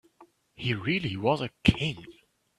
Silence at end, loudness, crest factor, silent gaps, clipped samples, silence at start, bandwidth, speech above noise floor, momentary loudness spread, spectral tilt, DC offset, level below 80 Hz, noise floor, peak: 0.45 s; -28 LUFS; 24 dB; none; under 0.1%; 0.2 s; 13 kHz; 32 dB; 8 LU; -6.5 dB/octave; under 0.1%; -48 dBFS; -60 dBFS; -6 dBFS